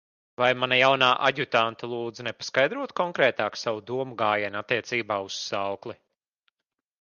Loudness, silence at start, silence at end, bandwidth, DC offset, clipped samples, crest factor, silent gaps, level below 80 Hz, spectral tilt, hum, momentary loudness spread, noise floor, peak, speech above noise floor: -25 LUFS; 0.4 s; 1.05 s; 7.2 kHz; under 0.1%; under 0.1%; 22 dB; none; -70 dBFS; -3.5 dB/octave; none; 13 LU; -86 dBFS; -6 dBFS; 61 dB